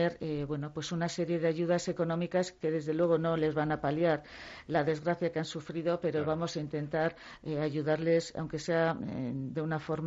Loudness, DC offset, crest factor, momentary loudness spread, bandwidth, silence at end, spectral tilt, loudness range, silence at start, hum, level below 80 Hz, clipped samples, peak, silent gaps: -32 LUFS; under 0.1%; 16 dB; 8 LU; 8 kHz; 0 s; -6.5 dB/octave; 2 LU; 0 s; none; -62 dBFS; under 0.1%; -14 dBFS; none